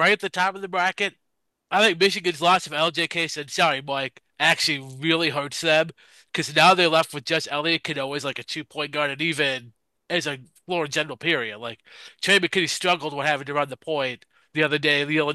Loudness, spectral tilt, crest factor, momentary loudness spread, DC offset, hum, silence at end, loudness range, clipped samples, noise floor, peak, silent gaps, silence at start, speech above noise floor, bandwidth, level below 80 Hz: -22 LUFS; -3 dB/octave; 20 dB; 11 LU; under 0.1%; none; 0 s; 5 LU; under 0.1%; -55 dBFS; -4 dBFS; none; 0 s; 32 dB; 12.5 kHz; -72 dBFS